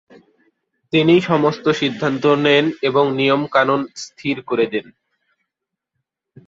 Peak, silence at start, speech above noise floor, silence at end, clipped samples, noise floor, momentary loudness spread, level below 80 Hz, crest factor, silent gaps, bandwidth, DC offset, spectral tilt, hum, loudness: -2 dBFS; 0.95 s; 65 dB; 1.65 s; under 0.1%; -82 dBFS; 10 LU; -60 dBFS; 18 dB; none; 7.8 kHz; under 0.1%; -6 dB/octave; none; -17 LUFS